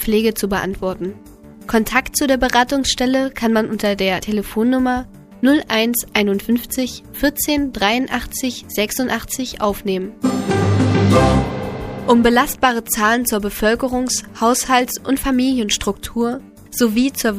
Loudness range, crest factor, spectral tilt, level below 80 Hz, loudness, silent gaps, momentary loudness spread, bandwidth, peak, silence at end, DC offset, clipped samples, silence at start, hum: 4 LU; 18 dB; -4.5 dB/octave; -36 dBFS; -18 LUFS; none; 8 LU; 15.5 kHz; 0 dBFS; 0 s; under 0.1%; under 0.1%; 0 s; none